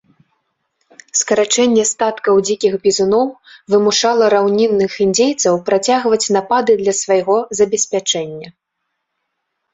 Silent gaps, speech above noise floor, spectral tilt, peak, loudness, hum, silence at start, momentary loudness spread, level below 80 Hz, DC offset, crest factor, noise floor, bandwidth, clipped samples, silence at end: none; 60 dB; -3 dB/octave; -2 dBFS; -14 LUFS; none; 1.15 s; 5 LU; -58 dBFS; under 0.1%; 14 dB; -74 dBFS; 8 kHz; under 0.1%; 1.25 s